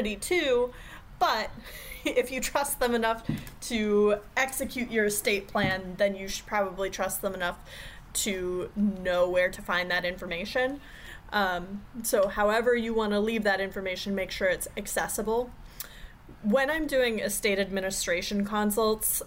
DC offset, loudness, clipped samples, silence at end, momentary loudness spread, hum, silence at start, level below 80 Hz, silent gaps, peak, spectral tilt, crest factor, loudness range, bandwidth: under 0.1%; -28 LUFS; under 0.1%; 0 s; 10 LU; none; 0 s; -48 dBFS; none; -14 dBFS; -3.5 dB/octave; 16 dB; 3 LU; 16 kHz